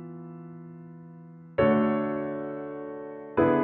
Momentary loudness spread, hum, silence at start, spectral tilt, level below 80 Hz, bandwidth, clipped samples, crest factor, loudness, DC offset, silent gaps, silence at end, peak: 22 LU; none; 0 s; -6.5 dB/octave; -60 dBFS; 4.2 kHz; under 0.1%; 18 dB; -28 LUFS; under 0.1%; none; 0 s; -10 dBFS